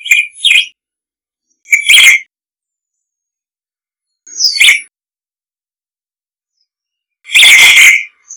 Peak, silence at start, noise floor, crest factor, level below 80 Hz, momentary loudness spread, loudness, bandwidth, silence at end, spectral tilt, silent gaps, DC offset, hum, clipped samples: 0 dBFS; 0.05 s; under -90 dBFS; 12 dB; -58 dBFS; 11 LU; -4 LUFS; over 20 kHz; 0 s; 4.5 dB/octave; none; under 0.1%; none; 3%